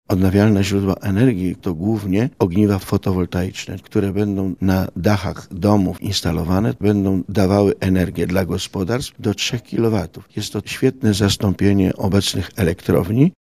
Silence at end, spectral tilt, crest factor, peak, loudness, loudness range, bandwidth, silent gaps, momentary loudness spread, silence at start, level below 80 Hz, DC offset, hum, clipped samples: 0.2 s; -6.5 dB/octave; 18 dB; 0 dBFS; -19 LUFS; 2 LU; 15.5 kHz; none; 7 LU; 0.1 s; -42 dBFS; 0.2%; none; under 0.1%